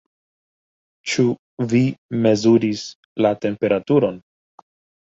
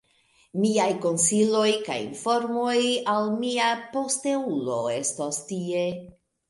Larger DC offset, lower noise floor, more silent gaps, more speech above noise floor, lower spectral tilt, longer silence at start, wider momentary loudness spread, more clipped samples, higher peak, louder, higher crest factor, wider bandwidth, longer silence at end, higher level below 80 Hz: neither; first, under -90 dBFS vs -63 dBFS; first, 1.39-1.57 s, 1.98-2.09 s, 2.95-3.16 s vs none; first, over 72 dB vs 38 dB; first, -6.5 dB/octave vs -3.5 dB/octave; first, 1.05 s vs 0.55 s; first, 12 LU vs 8 LU; neither; first, -4 dBFS vs -10 dBFS; first, -19 LUFS vs -25 LUFS; about the same, 16 dB vs 16 dB; second, 7.8 kHz vs 11.5 kHz; first, 0.85 s vs 0.4 s; first, -60 dBFS vs -70 dBFS